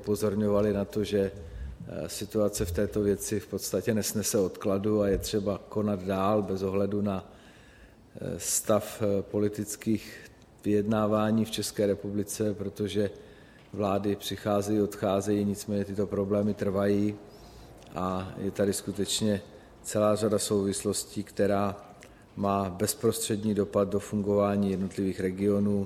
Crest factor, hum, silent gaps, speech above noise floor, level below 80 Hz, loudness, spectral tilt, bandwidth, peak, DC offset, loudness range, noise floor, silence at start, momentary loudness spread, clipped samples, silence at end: 18 dB; none; none; 26 dB; -52 dBFS; -29 LUFS; -5.5 dB/octave; 16 kHz; -12 dBFS; under 0.1%; 2 LU; -54 dBFS; 0 s; 8 LU; under 0.1%; 0 s